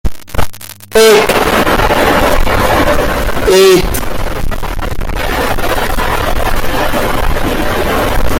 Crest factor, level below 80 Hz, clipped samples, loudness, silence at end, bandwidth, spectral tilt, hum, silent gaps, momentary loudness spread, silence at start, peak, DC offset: 10 dB; -18 dBFS; 0.2%; -12 LUFS; 0 s; 17 kHz; -4 dB/octave; none; none; 13 LU; 0.05 s; 0 dBFS; under 0.1%